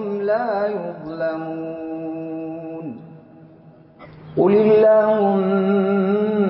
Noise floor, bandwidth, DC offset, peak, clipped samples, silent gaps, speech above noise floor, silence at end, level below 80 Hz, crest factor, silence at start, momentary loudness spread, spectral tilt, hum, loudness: -46 dBFS; 5.6 kHz; under 0.1%; -6 dBFS; under 0.1%; none; 29 dB; 0 s; -62 dBFS; 14 dB; 0 s; 17 LU; -12.5 dB/octave; none; -19 LUFS